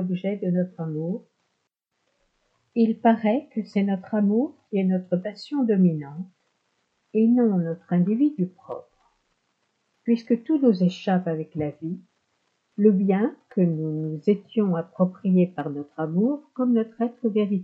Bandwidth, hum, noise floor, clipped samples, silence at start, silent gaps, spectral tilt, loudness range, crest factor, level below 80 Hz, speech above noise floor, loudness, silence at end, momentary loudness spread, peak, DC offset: 6.8 kHz; none; -77 dBFS; under 0.1%; 0 s; none; -10 dB/octave; 2 LU; 18 dB; -74 dBFS; 54 dB; -24 LUFS; 0 s; 11 LU; -6 dBFS; under 0.1%